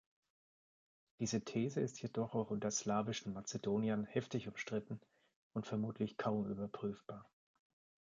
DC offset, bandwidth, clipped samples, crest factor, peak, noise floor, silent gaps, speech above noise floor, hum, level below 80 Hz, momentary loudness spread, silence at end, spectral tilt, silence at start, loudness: under 0.1%; 7.8 kHz; under 0.1%; 20 dB; -22 dBFS; under -90 dBFS; 5.36-5.50 s; over 50 dB; none; -74 dBFS; 9 LU; 0.9 s; -5 dB/octave; 1.2 s; -41 LUFS